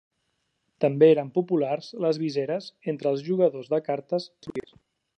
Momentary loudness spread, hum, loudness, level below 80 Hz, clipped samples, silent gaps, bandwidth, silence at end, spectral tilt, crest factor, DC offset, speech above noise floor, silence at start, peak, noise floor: 14 LU; none; -25 LUFS; -74 dBFS; under 0.1%; none; 8.4 kHz; 0.55 s; -7.5 dB/octave; 20 dB; under 0.1%; 51 dB; 0.8 s; -6 dBFS; -75 dBFS